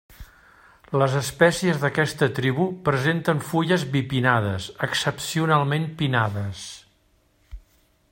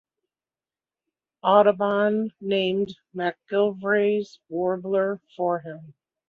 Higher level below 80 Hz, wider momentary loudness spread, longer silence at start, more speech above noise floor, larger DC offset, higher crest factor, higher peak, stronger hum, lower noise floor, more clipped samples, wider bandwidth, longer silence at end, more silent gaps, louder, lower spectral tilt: first, -52 dBFS vs -72 dBFS; second, 8 LU vs 11 LU; second, 0.1 s vs 1.45 s; second, 40 dB vs over 67 dB; neither; about the same, 22 dB vs 22 dB; about the same, -2 dBFS vs -4 dBFS; neither; second, -63 dBFS vs under -90 dBFS; neither; first, 16.5 kHz vs 6.8 kHz; first, 0.55 s vs 0.35 s; neither; about the same, -23 LUFS vs -24 LUFS; second, -5.5 dB/octave vs -7.5 dB/octave